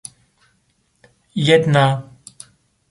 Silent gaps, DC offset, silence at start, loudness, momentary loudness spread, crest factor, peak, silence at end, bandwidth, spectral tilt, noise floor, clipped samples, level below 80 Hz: none; under 0.1%; 1.35 s; -16 LUFS; 26 LU; 18 dB; -2 dBFS; 0.9 s; 11.5 kHz; -6 dB/octave; -64 dBFS; under 0.1%; -58 dBFS